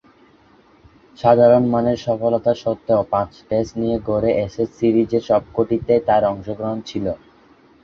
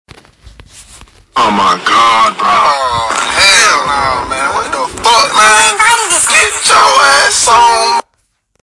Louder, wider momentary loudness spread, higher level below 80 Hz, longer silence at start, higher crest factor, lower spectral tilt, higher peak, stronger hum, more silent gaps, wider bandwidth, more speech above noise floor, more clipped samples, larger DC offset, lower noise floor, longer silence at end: second, -19 LUFS vs -8 LUFS; first, 12 LU vs 8 LU; second, -48 dBFS vs -40 dBFS; first, 1.2 s vs 0.45 s; first, 18 dB vs 10 dB; first, -8 dB/octave vs 0 dB/octave; about the same, -2 dBFS vs 0 dBFS; neither; neither; second, 7 kHz vs 12 kHz; second, 34 dB vs 52 dB; second, under 0.1% vs 0.2%; neither; second, -52 dBFS vs -60 dBFS; about the same, 0.65 s vs 0.7 s